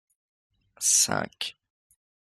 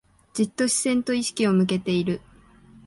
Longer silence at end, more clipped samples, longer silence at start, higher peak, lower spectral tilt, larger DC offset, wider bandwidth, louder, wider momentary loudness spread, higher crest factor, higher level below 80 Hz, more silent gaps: first, 0.85 s vs 0.7 s; neither; first, 0.8 s vs 0.35 s; about the same, -8 dBFS vs -10 dBFS; second, -0.5 dB/octave vs -4.5 dB/octave; neither; first, 15.5 kHz vs 11.5 kHz; about the same, -24 LUFS vs -23 LUFS; first, 15 LU vs 8 LU; first, 22 dB vs 14 dB; second, -72 dBFS vs -58 dBFS; neither